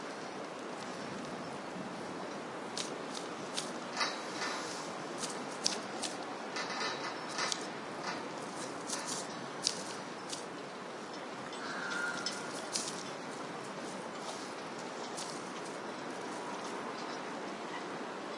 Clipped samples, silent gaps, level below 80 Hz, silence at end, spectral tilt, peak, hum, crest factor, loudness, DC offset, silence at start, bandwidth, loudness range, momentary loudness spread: under 0.1%; none; -84 dBFS; 0 s; -2 dB/octave; -10 dBFS; none; 30 dB; -39 LUFS; under 0.1%; 0 s; 11.5 kHz; 4 LU; 7 LU